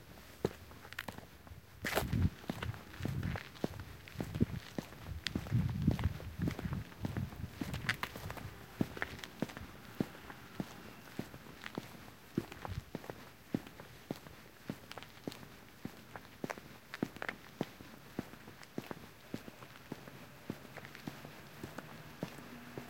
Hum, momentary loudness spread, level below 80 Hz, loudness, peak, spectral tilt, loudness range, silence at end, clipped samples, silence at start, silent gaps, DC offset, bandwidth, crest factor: none; 15 LU; -54 dBFS; -43 LUFS; -12 dBFS; -6 dB/octave; 10 LU; 0 s; under 0.1%; 0 s; none; under 0.1%; 17 kHz; 32 dB